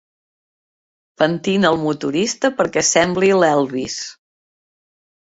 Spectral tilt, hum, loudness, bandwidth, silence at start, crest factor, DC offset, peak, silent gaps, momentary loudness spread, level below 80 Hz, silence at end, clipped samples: -3.5 dB/octave; none; -17 LUFS; 8 kHz; 1.2 s; 18 dB; under 0.1%; -2 dBFS; none; 9 LU; -56 dBFS; 1.1 s; under 0.1%